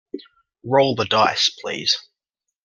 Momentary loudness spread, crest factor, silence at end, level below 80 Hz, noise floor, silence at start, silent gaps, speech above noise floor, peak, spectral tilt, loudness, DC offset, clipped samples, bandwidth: 20 LU; 20 dB; 0.65 s; -64 dBFS; -83 dBFS; 0.15 s; none; 63 dB; -2 dBFS; -3 dB/octave; -19 LUFS; under 0.1%; under 0.1%; 12 kHz